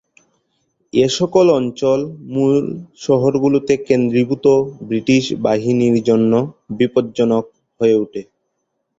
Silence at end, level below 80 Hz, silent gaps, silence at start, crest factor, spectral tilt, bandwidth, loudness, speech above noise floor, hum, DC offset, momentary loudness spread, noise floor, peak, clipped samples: 0.75 s; -56 dBFS; none; 0.95 s; 16 dB; -6.5 dB/octave; 7.8 kHz; -16 LUFS; 56 dB; none; under 0.1%; 7 LU; -72 dBFS; -2 dBFS; under 0.1%